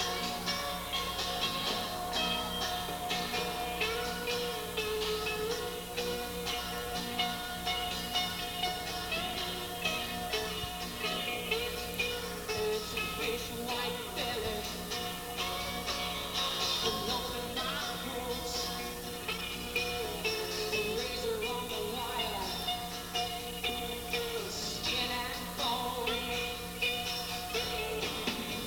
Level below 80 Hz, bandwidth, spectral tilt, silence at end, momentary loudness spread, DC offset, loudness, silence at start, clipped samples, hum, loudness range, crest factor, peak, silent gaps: -52 dBFS; over 20 kHz; -2.5 dB/octave; 0 s; 4 LU; under 0.1%; -34 LUFS; 0 s; under 0.1%; none; 2 LU; 18 dB; -18 dBFS; none